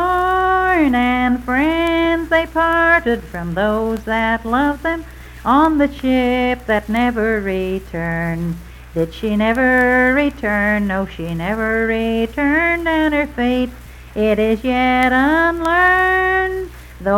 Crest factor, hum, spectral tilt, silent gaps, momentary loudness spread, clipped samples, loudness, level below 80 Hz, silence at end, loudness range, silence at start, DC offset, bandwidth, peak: 16 dB; none; -6.5 dB/octave; none; 10 LU; under 0.1%; -16 LUFS; -34 dBFS; 0 s; 3 LU; 0 s; under 0.1%; 16.5 kHz; 0 dBFS